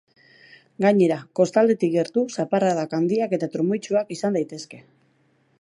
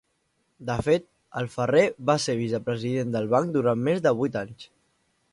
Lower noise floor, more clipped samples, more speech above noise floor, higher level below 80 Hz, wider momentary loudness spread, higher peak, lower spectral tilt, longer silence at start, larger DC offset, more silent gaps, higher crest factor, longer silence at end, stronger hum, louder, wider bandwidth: second, -63 dBFS vs -72 dBFS; neither; second, 42 dB vs 48 dB; second, -74 dBFS vs -56 dBFS; second, 6 LU vs 12 LU; about the same, -6 dBFS vs -6 dBFS; about the same, -6.5 dB/octave vs -6 dB/octave; first, 0.8 s vs 0.6 s; neither; neither; about the same, 18 dB vs 20 dB; first, 0.8 s vs 0.65 s; neither; first, -22 LUFS vs -25 LUFS; about the same, 11 kHz vs 11.5 kHz